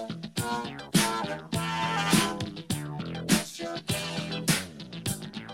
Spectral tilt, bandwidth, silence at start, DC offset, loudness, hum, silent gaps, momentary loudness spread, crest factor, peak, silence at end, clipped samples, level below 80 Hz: -3.5 dB/octave; 16.5 kHz; 0 s; under 0.1%; -29 LUFS; none; none; 10 LU; 20 dB; -10 dBFS; 0 s; under 0.1%; -58 dBFS